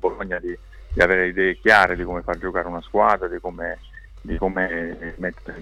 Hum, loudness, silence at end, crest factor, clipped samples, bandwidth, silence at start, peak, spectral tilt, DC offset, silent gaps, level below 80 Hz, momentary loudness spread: none; -21 LUFS; 0 s; 20 dB; under 0.1%; 15.5 kHz; 0 s; -4 dBFS; -5.5 dB/octave; under 0.1%; none; -38 dBFS; 16 LU